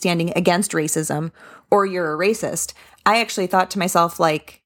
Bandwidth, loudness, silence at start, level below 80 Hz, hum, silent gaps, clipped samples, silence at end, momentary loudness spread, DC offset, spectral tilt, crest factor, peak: 19.5 kHz; -20 LUFS; 0 s; -58 dBFS; none; none; under 0.1%; 0.15 s; 7 LU; under 0.1%; -4 dB/octave; 18 dB; -2 dBFS